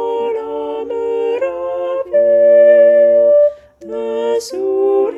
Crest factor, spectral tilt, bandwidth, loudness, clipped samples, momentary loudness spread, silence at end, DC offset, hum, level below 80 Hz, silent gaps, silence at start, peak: 12 dB; -4 dB/octave; 11.5 kHz; -13 LUFS; under 0.1%; 14 LU; 0 s; under 0.1%; none; -56 dBFS; none; 0 s; 0 dBFS